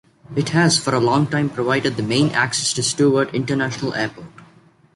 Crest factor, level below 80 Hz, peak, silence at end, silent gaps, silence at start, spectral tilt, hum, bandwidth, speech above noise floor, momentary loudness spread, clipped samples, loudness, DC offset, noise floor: 16 dB; -56 dBFS; -4 dBFS; 0.5 s; none; 0.3 s; -4.5 dB/octave; none; 11.5 kHz; 33 dB; 7 LU; under 0.1%; -19 LUFS; under 0.1%; -51 dBFS